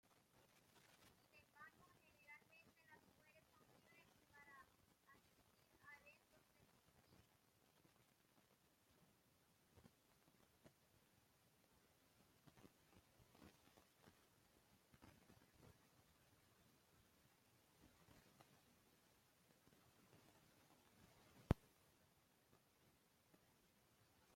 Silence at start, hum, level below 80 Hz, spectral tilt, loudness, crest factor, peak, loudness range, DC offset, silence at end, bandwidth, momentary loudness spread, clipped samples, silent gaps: 0.05 s; none; -72 dBFS; -6 dB/octave; -50 LUFS; 42 dB; -22 dBFS; 13 LU; under 0.1%; 0 s; 16 kHz; 22 LU; under 0.1%; none